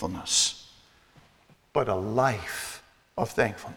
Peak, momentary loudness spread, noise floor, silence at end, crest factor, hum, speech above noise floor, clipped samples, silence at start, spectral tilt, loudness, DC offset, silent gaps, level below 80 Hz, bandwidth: -10 dBFS; 16 LU; -60 dBFS; 0 s; 20 dB; none; 33 dB; under 0.1%; 0 s; -2.5 dB/octave; -27 LUFS; under 0.1%; none; -56 dBFS; over 20 kHz